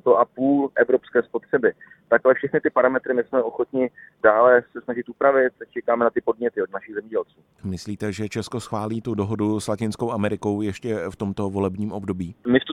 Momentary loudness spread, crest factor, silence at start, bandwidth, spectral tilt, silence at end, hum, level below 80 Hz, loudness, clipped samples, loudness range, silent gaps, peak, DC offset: 11 LU; 20 dB; 0.05 s; 12.5 kHz; -6.5 dB/octave; 0 s; none; -58 dBFS; -23 LUFS; under 0.1%; 7 LU; none; -2 dBFS; under 0.1%